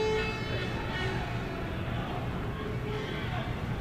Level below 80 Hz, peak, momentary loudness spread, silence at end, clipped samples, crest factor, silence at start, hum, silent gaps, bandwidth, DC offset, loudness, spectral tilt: -42 dBFS; -20 dBFS; 3 LU; 0 s; under 0.1%; 14 dB; 0 s; none; none; 15 kHz; under 0.1%; -34 LUFS; -6.5 dB/octave